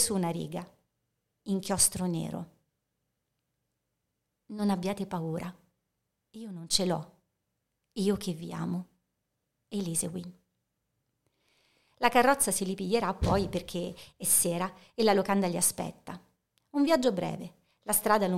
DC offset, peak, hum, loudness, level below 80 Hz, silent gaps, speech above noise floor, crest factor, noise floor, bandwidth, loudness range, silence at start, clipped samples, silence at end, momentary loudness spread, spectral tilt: under 0.1%; -8 dBFS; none; -29 LUFS; -52 dBFS; none; 53 dB; 24 dB; -83 dBFS; 16.5 kHz; 9 LU; 0 s; under 0.1%; 0 s; 19 LU; -4 dB/octave